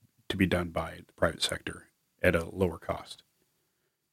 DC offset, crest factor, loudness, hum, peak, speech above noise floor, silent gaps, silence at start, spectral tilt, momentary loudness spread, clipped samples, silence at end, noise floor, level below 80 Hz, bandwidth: under 0.1%; 24 dB; -31 LUFS; none; -8 dBFS; 47 dB; none; 0.3 s; -5 dB/octave; 14 LU; under 0.1%; 0.95 s; -78 dBFS; -52 dBFS; 16 kHz